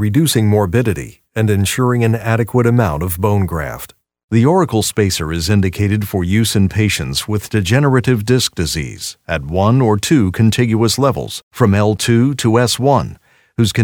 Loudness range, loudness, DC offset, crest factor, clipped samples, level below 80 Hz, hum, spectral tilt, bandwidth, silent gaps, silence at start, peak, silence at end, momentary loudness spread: 2 LU; -15 LUFS; under 0.1%; 14 dB; under 0.1%; -38 dBFS; none; -5.5 dB/octave; 20 kHz; 4.24-4.28 s, 11.43-11.51 s; 0 s; 0 dBFS; 0 s; 9 LU